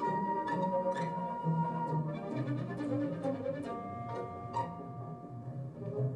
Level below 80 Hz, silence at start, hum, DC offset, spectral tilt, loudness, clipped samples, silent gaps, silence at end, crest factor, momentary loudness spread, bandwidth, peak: -70 dBFS; 0 s; none; under 0.1%; -8.5 dB/octave; -37 LUFS; under 0.1%; none; 0 s; 14 dB; 10 LU; 10 kHz; -22 dBFS